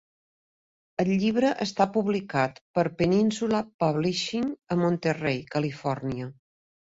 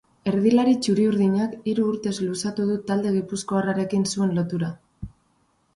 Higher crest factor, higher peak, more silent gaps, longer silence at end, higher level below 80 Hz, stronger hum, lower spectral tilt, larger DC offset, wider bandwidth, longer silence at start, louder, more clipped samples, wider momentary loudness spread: about the same, 18 dB vs 16 dB; about the same, -10 dBFS vs -8 dBFS; first, 2.61-2.74 s, 3.74-3.79 s vs none; about the same, 0.55 s vs 0.65 s; about the same, -60 dBFS vs -56 dBFS; neither; about the same, -6 dB/octave vs -6 dB/octave; neither; second, 8 kHz vs 11.5 kHz; first, 1 s vs 0.25 s; second, -26 LUFS vs -23 LUFS; neither; about the same, 7 LU vs 9 LU